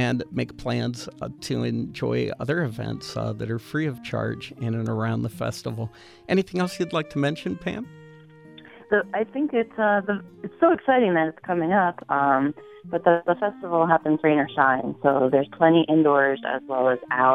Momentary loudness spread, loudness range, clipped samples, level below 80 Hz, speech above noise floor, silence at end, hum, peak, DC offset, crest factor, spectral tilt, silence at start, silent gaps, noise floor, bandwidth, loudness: 11 LU; 7 LU; under 0.1%; -58 dBFS; 24 dB; 0 s; none; -4 dBFS; under 0.1%; 20 dB; -7 dB/octave; 0 s; none; -47 dBFS; 14.5 kHz; -24 LUFS